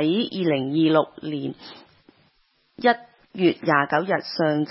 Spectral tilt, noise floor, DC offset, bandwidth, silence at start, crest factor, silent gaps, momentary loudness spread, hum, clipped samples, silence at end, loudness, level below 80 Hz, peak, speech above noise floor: -10 dB/octave; -65 dBFS; under 0.1%; 5.8 kHz; 0 s; 20 dB; none; 13 LU; none; under 0.1%; 0 s; -23 LUFS; -70 dBFS; -4 dBFS; 43 dB